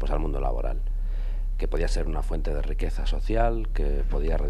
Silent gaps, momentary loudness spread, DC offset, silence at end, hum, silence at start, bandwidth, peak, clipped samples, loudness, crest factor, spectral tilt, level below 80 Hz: none; 7 LU; under 0.1%; 0 s; none; 0 s; 8.6 kHz; -10 dBFS; under 0.1%; -30 LUFS; 12 dB; -7 dB/octave; -24 dBFS